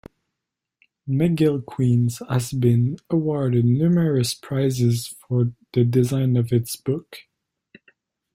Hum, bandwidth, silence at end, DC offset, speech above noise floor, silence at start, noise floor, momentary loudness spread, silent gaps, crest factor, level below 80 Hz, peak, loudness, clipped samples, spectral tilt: none; 16 kHz; 1.15 s; under 0.1%; 63 dB; 1.05 s; -83 dBFS; 7 LU; none; 16 dB; -56 dBFS; -6 dBFS; -21 LUFS; under 0.1%; -7 dB/octave